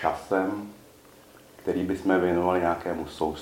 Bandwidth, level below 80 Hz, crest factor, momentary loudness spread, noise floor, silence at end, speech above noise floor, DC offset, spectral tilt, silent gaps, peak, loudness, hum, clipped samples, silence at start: 17 kHz; -54 dBFS; 18 dB; 11 LU; -52 dBFS; 0 s; 26 dB; under 0.1%; -6.5 dB/octave; none; -8 dBFS; -27 LUFS; none; under 0.1%; 0 s